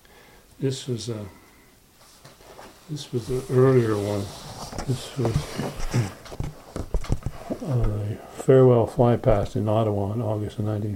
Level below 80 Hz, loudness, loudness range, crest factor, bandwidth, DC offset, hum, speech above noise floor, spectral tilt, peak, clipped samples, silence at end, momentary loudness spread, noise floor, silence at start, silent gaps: -36 dBFS; -24 LUFS; 8 LU; 20 dB; 16 kHz; under 0.1%; none; 31 dB; -7 dB/octave; -4 dBFS; under 0.1%; 0 s; 17 LU; -54 dBFS; 0.6 s; none